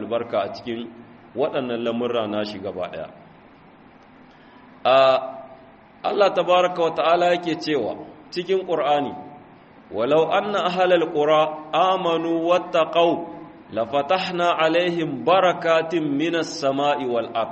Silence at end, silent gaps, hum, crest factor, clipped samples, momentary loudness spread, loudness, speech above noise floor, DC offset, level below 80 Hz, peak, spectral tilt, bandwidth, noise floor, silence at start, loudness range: 0 s; none; none; 18 dB; under 0.1%; 13 LU; -21 LUFS; 28 dB; under 0.1%; -66 dBFS; -4 dBFS; -5 dB/octave; 8.2 kHz; -49 dBFS; 0 s; 7 LU